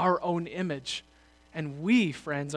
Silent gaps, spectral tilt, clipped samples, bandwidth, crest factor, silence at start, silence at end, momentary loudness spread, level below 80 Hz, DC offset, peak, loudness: none; -5.5 dB/octave; under 0.1%; 11 kHz; 18 dB; 0 s; 0 s; 12 LU; -64 dBFS; under 0.1%; -12 dBFS; -30 LUFS